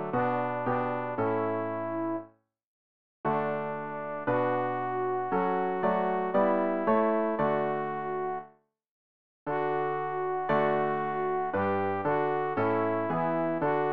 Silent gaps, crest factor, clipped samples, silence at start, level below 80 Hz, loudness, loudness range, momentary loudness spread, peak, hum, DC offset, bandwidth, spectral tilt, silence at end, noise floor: 2.64-3.24 s, 8.91-9.46 s; 16 dB; under 0.1%; 0 s; -66 dBFS; -29 LUFS; 5 LU; 7 LU; -14 dBFS; none; 0.3%; 5 kHz; -10 dB/octave; 0 s; -56 dBFS